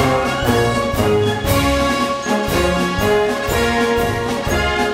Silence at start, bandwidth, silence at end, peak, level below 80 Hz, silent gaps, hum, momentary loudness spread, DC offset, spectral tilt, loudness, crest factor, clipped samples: 0 s; 16.5 kHz; 0 s; -2 dBFS; -30 dBFS; none; none; 3 LU; under 0.1%; -5 dB/octave; -17 LUFS; 14 dB; under 0.1%